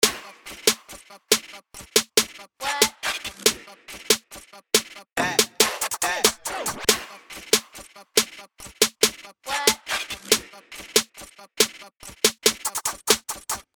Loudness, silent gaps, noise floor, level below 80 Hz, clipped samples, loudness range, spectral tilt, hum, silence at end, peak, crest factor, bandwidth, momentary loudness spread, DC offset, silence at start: -22 LUFS; none; -46 dBFS; -58 dBFS; under 0.1%; 1 LU; 0 dB/octave; none; 0.15 s; -2 dBFS; 24 dB; over 20 kHz; 21 LU; under 0.1%; 0 s